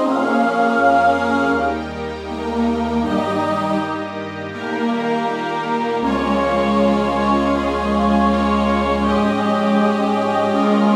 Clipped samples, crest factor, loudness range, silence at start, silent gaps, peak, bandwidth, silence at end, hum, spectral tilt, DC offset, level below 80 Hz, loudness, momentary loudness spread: under 0.1%; 14 dB; 4 LU; 0 s; none; -2 dBFS; 11 kHz; 0 s; none; -6.5 dB/octave; under 0.1%; -38 dBFS; -18 LUFS; 9 LU